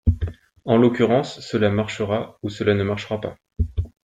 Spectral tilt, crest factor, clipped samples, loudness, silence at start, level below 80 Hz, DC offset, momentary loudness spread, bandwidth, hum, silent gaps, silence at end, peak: -7 dB/octave; 18 dB; under 0.1%; -22 LUFS; 0.05 s; -34 dBFS; under 0.1%; 12 LU; 9.2 kHz; none; none; 0.15 s; -4 dBFS